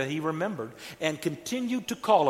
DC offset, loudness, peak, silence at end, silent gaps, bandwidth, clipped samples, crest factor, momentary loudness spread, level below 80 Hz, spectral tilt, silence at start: under 0.1%; -31 LUFS; -8 dBFS; 0 s; none; 16.5 kHz; under 0.1%; 20 dB; 5 LU; -70 dBFS; -5 dB/octave; 0 s